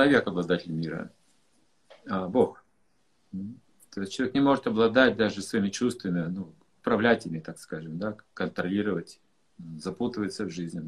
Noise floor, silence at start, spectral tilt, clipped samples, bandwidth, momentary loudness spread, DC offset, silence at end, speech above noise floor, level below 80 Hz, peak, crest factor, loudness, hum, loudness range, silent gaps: -72 dBFS; 0 s; -5.5 dB/octave; under 0.1%; 12.5 kHz; 16 LU; under 0.1%; 0 s; 44 dB; -62 dBFS; -4 dBFS; 24 dB; -28 LUFS; none; 7 LU; none